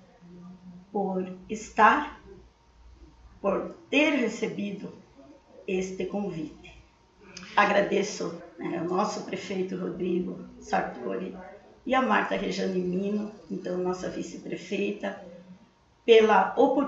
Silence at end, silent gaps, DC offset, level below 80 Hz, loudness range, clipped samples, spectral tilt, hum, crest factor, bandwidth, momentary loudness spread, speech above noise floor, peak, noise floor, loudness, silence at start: 0 s; none; under 0.1%; -60 dBFS; 5 LU; under 0.1%; -5 dB/octave; none; 22 dB; 8 kHz; 19 LU; 33 dB; -6 dBFS; -59 dBFS; -27 LUFS; 0.25 s